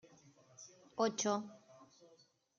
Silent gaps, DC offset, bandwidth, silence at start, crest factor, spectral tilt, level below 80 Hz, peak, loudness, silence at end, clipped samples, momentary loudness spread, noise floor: none; under 0.1%; 10 kHz; 0.6 s; 22 dB; -3.5 dB/octave; -88 dBFS; -20 dBFS; -38 LUFS; 0.75 s; under 0.1%; 22 LU; -70 dBFS